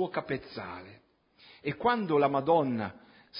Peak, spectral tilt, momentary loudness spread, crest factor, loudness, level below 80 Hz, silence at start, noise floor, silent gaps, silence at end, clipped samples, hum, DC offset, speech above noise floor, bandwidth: -12 dBFS; -10 dB/octave; 15 LU; 20 dB; -29 LUFS; -66 dBFS; 0 s; -59 dBFS; none; 0 s; under 0.1%; none; under 0.1%; 29 dB; 5.4 kHz